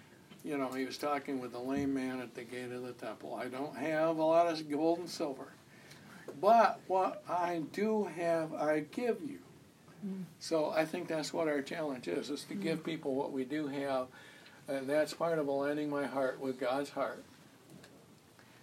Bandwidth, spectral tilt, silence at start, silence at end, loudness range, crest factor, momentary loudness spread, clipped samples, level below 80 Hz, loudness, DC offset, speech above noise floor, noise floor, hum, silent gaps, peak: 16 kHz; -5.5 dB/octave; 0 s; 0.05 s; 6 LU; 20 dB; 14 LU; under 0.1%; -80 dBFS; -35 LUFS; under 0.1%; 26 dB; -60 dBFS; none; none; -16 dBFS